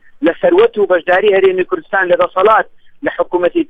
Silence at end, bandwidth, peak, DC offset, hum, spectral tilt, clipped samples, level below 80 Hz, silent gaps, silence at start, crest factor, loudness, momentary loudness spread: 0.05 s; 4.7 kHz; 0 dBFS; under 0.1%; none; -7 dB/octave; under 0.1%; -52 dBFS; none; 0.2 s; 12 dB; -13 LUFS; 8 LU